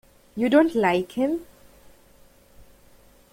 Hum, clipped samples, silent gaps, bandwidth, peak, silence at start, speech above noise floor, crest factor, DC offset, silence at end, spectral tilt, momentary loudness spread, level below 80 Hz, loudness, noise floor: none; under 0.1%; none; 16.5 kHz; -4 dBFS; 0.35 s; 33 dB; 20 dB; under 0.1%; 1.9 s; -6 dB/octave; 12 LU; -58 dBFS; -22 LUFS; -54 dBFS